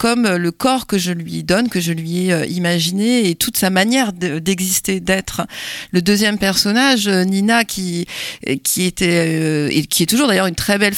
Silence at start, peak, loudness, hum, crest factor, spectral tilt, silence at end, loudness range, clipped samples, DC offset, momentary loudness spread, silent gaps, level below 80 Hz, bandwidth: 0 s; -2 dBFS; -16 LUFS; none; 14 dB; -4 dB/octave; 0 s; 1 LU; under 0.1%; under 0.1%; 8 LU; none; -46 dBFS; 17.5 kHz